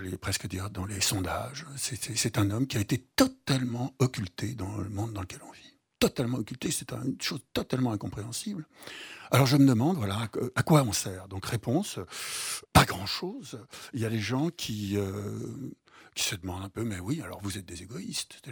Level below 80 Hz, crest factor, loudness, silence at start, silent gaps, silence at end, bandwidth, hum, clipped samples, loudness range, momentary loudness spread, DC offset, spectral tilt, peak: -52 dBFS; 26 dB; -30 LUFS; 0 s; none; 0 s; over 20 kHz; none; under 0.1%; 7 LU; 16 LU; under 0.1%; -4.5 dB/octave; -4 dBFS